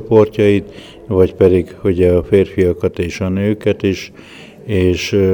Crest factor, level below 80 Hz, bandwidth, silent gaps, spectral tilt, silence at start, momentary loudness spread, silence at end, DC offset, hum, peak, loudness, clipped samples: 14 dB; -38 dBFS; 19.5 kHz; none; -7 dB/octave; 0 s; 10 LU; 0 s; under 0.1%; none; 0 dBFS; -15 LUFS; under 0.1%